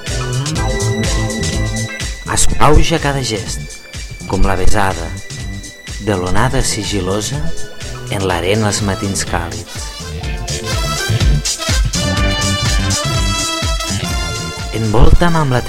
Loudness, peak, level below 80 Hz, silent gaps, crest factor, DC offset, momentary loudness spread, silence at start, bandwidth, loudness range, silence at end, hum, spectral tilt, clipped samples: -16 LUFS; 0 dBFS; -20 dBFS; none; 14 dB; under 0.1%; 12 LU; 0 s; 16 kHz; 4 LU; 0 s; none; -4 dB/octave; under 0.1%